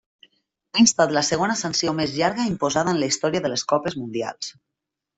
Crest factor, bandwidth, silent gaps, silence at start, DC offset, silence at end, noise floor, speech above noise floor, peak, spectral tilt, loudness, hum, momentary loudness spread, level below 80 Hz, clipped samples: 20 dB; 8.4 kHz; none; 0.75 s; under 0.1%; 0.65 s; -84 dBFS; 62 dB; -4 dBFS; -3.5 dB/octave; -22 LUFS; none; 11 LU; -58 dBFS; under 0.1%